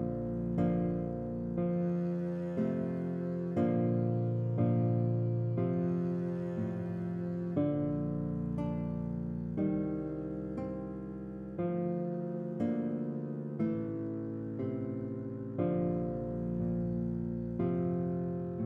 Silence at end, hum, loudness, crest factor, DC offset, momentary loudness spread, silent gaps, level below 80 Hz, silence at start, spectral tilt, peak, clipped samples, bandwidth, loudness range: 0 s; none; -35 LUFS; 16 dB; under 0.1%; 7 LU; none; -56 dBFS; 0 s; -11.5 dB/octave; -18 dBFS; under 0.1%; 3.5 kHz; 5 LU